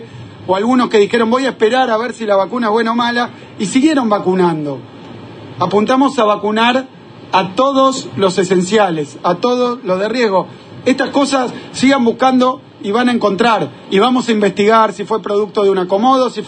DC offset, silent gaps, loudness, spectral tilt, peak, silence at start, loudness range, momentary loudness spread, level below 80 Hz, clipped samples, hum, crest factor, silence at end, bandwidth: under 0.1%; none; -14 LUFS; -5 dB/octave; 0 dBFS; 0 s; 2 LU; 9 LU; -60 dBFS; under 0.1%; none; 14 dB; 0 s; 9.4 kHz